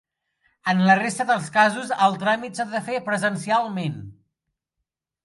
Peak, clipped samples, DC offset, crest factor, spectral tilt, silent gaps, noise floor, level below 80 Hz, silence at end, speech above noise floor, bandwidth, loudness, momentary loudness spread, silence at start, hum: -4 dBFS; under 0.1%; under 0.1%; 20 dB; -5 dB/octave; none; -82 dBFS; -66 dBFS; 1.15 s; 61 dB; 11.5 kHz; -22 LUFS; 10 LU; 0.65 s; none